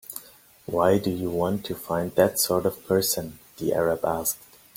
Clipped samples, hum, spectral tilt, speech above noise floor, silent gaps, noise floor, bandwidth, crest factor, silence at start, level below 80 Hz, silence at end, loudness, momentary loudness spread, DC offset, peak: under 0.1%; none; -4.5 dB/octave; 26 dB; none; -51 dBFS; 17 kHz; 20 dB; 0.1 s; -56 dBFS; 0.4 s; -25 LUFS; 13 LU; under 0.1%; -6 dBFS